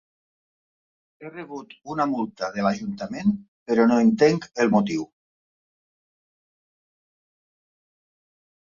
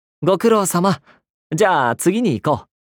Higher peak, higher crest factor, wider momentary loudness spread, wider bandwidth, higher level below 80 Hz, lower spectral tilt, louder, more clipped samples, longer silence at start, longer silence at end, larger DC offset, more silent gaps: about the same, -6 dBFS vs -4 dBFS; first, 20 dB vs 14 dB; first, 20 LU vs 8 LU; second, 7.4 kHz vs over 20 kHz; about the same, -64 dBFS vs -60 dBFS; first, -6.5 dB/octave vs -5 dB/octave; second, -23 LUFS vs -18 LUFS; neither; first, 1.2 s vs 0.2 s; first, 3.7 s vs 0.35 s; neither; about the same, 3.48-3.66 s vs 1.30-1.50 s